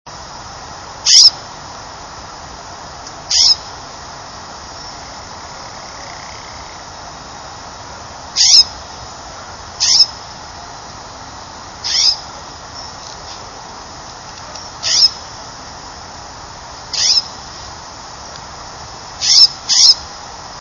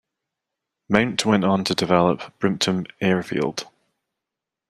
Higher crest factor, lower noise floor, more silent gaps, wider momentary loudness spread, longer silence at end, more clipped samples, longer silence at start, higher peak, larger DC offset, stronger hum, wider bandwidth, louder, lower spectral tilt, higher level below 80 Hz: about the same, 18 dB vs 22 dB; second, -32 dBFS vs -86 dBFS; neither; first, 24 LU vs 6 LU; second, 0 s vs 1.05 s; first, 0.1% vs under 0.1%; second, 0.05 s vs 0.9 s; about the same, 0 dBFS vs 0 dBFS; neither; neither; second, 11 kHz vs 13.5 kHz; first, -9 LUFS vs -21 LUFS; second, 1 dB/octave vs -5 dB/octave; first, -44 dBFS vs -58 dBFS